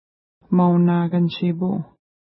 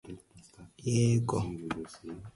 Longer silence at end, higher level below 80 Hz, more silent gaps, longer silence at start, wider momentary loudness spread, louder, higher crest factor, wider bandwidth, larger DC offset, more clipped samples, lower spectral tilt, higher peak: first, 0.45 s vs 0.05 s; second, -64 dBFS vs -56 dBFS; neither; first, 0.5 s vs 0.05 s; second, 10 LU vs 20 LU; first, -20 LUFS vs -31 LUFS; about the same, 14 dB vs 16 dB; second, 5.6 kHz vs 11.5 kHz; neither; neither; first, -13 dB/octave vs -6.5 dB/octave; first, -8 dBFS vs -16 dBFS